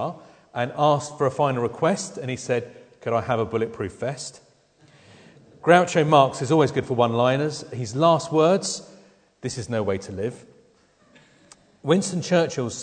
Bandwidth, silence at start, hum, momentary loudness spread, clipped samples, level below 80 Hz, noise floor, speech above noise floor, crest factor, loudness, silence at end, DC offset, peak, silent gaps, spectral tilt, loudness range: 9.4 kHz; 0 s; none; 14 LU; under 0.1%; -62 dBFS; -59 dBFS; 37 dB; 22 dB; -23 LUFS; 0 s; under 0.1%; -2 dBFS; none; -5.5 dB/octave; 8 LU